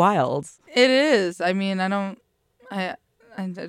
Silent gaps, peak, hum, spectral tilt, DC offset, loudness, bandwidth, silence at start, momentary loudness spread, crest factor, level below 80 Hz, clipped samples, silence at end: none; -4 dBFS; none; -5 dB/octave; under 0.1%; -22 LUFS; 12.5 kHz; 0 s; 16 LU; 20 dB; -70 dBFS; under 0.1%; 0 s